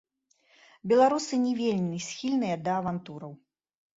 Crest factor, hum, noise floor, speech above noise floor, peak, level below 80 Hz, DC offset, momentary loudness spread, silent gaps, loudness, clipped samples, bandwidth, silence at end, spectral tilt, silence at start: 18 dB; none; -67 dBFS; 40 dB; -10 dBFS; -70 dBFS; under 0.1%; 19 LU; none; -27 LUFS; under 0.1%; 8 kHz; 0.6 s; -5.5 dB/octave; 0.85 s